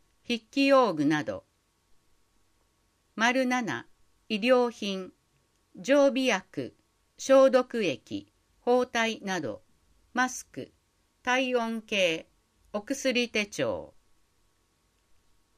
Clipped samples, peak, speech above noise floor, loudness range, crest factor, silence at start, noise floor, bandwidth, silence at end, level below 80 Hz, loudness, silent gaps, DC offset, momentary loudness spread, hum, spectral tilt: under 0.1%; -10 dBFS; 44 dB; 5 LU; 20 dB; 0.3 s; -71 dBFS; 14.5 kHz; 1.7 s; -70 dBFS; -27 LUFS; none; under 0.1%; 16 LU; none; -4 dB/octave